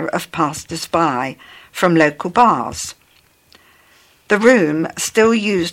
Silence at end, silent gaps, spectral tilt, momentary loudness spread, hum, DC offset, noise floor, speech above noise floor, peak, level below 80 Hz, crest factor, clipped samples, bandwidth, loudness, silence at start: 0 s; none; -4.5 dB/octave; 13 LU; none; under 0.1%; -54 dBFS; 38 dB; 0 dBFS; -52 dBFS; 18 dB; under 0.1%; 17 kHz; -16 LUFS; 0 s